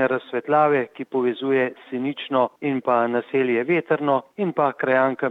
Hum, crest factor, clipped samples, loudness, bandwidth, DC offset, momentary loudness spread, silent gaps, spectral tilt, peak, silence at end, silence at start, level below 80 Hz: none; 16 dB; under 0.1%; -22 LUFS; 4.7 kHz; under 0.1%; 6 LU; none; -8.5 dB/octave; -6 dBFS; 0 s; 0 s; -76 dBFS